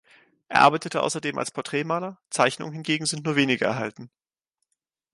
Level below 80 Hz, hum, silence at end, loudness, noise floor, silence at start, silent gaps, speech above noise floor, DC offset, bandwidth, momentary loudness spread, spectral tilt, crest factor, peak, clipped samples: -70 dBFS; none; 1.05 s; -24 LUFS; -82 dBFS; 0.5 s; none; 57 dB; under 0.1%; 11.5 kHz; 12 LU; -4 dB/octave; 22 dB; -4 dBFS; under 0.1%